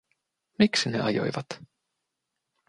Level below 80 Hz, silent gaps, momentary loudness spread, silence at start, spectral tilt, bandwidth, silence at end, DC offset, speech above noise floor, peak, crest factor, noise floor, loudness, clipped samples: -66 dBFS; none; 17 LU; 0.6 s; -4.5 dB/octave; 11 kHz; 1.05 s; under 0.1%; 57 dB; -6 dBFS; 24 dB; -83 dBFS; -26 LUFS; under 0.1%